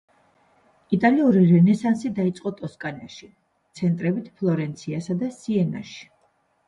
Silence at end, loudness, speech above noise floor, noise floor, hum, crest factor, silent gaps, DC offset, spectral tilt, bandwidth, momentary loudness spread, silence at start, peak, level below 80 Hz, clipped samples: 0.65 s; -22 LUFS; 44 dB; -66 dBFS; none; 18 dB; none; under 0.1%; -8 dB/octave; 9.8 kHz; 18 LU; 0.9 s; -6 dBFS; -64 dBFS; under 0.1%